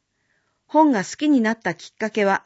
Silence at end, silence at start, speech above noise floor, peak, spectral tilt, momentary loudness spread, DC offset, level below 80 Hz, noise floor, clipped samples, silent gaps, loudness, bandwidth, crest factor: 0.05 s; 0.75 s; 49 dB; -4 dBFS; -5 dB/octave; 10 LU; under 0.1%; -72 dBFS; -69 dBFS; under 0.1%; none; -21 LUFS; 8 kHz; 16 dB